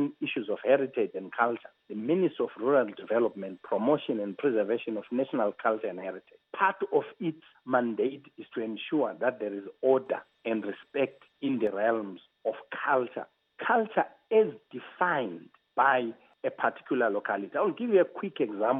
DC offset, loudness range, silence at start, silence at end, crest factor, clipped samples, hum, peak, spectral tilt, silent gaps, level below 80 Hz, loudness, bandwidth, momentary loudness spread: under 0.1%; 3 LU; 0 s; 0 s; 20 dB; under 0.1%; none; -10 dBFS; -9 dB/octave; none; -86 dBFS; -30 LUFS; 3.9 kHz; 11 LU